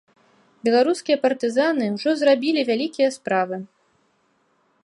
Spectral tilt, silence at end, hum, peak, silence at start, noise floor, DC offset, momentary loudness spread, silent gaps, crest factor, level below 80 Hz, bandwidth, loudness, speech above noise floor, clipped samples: -4.5 dB/octave; 1.2 s; none; -6 dBFS; 0.65 s; -65 dBFS; under 0.1%; 5 LU; none; 16 dB; -76 dBFS; 11.5 kHz; -21 LUFS; 45 dB; under 0.1%